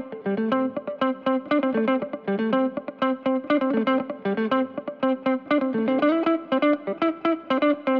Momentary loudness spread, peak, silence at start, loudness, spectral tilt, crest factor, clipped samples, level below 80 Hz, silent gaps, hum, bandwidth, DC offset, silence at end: 5 LU; -8 dBFS; 0 s; -24 LUFS; -8 dB/octave; 14 dB; under 0.1%; -70 dBFS; none; none; 5.2 kHz; under 0.1%; 0 s